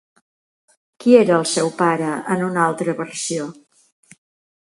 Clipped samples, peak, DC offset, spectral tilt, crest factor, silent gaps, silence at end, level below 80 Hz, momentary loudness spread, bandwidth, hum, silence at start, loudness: under 0.1%; 0 dBFS; under 0.1%; -4.5 dB/octave; 20 dB; none; 1.15 s; -68 dBFS; 11 LU; 11.5 kHz; none; 1 s; -18 LUFS